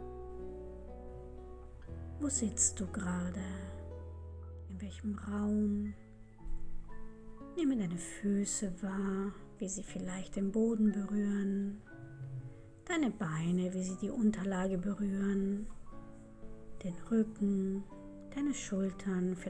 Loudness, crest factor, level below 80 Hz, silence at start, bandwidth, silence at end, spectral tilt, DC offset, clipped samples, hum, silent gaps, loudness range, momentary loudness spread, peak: -36 LUFS; 20 dB; -50 dBFS; 0 s; 10.5 kHz; 0 s; -5.5 dB/octave; under 0.1%; under 0.1%; none; none; 4 LU; 20 LU; -18 dBFS